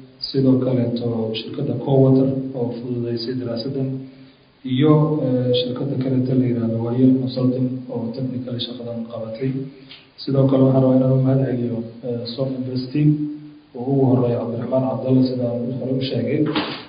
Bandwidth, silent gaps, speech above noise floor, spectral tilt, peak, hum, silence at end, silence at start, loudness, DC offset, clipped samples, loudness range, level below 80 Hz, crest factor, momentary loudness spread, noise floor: 5.2 kHz; none; 28 dB; -12.5 dB/octave; 0 dBFS; none; 0 s; 0 s; -20 LUFS; under 0.1%; under 0.1%; 3 LU; -56 dBFS; 18 dB; 12 LU; -47 dBFS